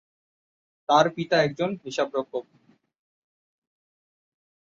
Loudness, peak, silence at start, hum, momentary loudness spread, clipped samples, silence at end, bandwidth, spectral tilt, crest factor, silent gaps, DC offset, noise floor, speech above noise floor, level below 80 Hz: -24 LUFS; -6 dBFS; 0.9 s; none; 14 LU; under 0.1%; 2.25 s; 7.6 kHz; -5 dB/octave; 24 dB; none; under 0.1%; under -90 dBFS; over 66 dB; -70 dBFS